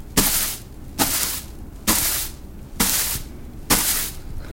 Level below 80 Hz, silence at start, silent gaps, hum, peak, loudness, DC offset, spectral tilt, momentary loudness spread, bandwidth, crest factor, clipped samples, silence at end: -36 dBFS; 0 s; none; none; 0 dBFS; -20 LUFS; under 0.1%; -1.5 dB/octave; 20 LU; 17 kHz; 24 dB; under 0.1%; 0 s